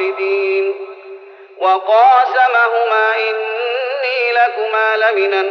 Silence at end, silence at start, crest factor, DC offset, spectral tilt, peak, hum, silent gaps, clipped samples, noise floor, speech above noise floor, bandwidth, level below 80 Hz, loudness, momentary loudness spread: 0 s; 0 s; 14 dB; under 0.1%; 4 dB/octave; -2 dBFS; none; none; under 0.1%; -36 dBFS; 23 dB; 6.4 kHz; -82 dBFS; -14 LUFS; 9 LU